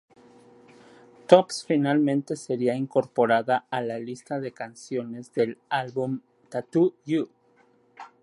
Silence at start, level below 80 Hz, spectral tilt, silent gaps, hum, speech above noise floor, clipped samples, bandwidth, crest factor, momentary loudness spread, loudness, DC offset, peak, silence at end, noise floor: 1.3 s; -76 dBFS; -6 dB/octave; none; none; 37 dB; under 0.1%; 11.5 kHz; 24 dB; 15 LU; -26 LUFS; under 0.1%; -2 dBFS; 0.15 s; -62 dBFS